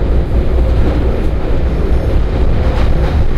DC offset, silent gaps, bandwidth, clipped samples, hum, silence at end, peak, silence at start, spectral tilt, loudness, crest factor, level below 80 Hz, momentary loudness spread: under 0.1%; none; 6.4 kHz; under 0.1%; none; 0 s; 0 dBFS; 0 s; -8.5 dB/octave; -15 LUFS; 10 dB; -12 dBFS; 3 LU